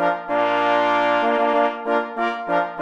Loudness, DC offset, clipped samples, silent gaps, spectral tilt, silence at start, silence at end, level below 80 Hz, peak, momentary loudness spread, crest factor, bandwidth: -20 LUFS; under 0.1%; under 0.1%; none; -5 dB/octave; 0 s; 0 s; -64 dBFS; -6 dBFS; 5 LU; 14 dB; 8.2 kHz